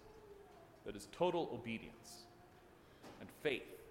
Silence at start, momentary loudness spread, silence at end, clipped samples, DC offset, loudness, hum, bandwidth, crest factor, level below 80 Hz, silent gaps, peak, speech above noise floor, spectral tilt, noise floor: 0 s; 24 LU; 0 s; under 0.1%; under 0.1%; -43 LUFS; none; 16.5 kHz; 24 dB; -70 dBFS; none; -22 dBFS; 20 dB; -5 dB/octave; -64 dBFS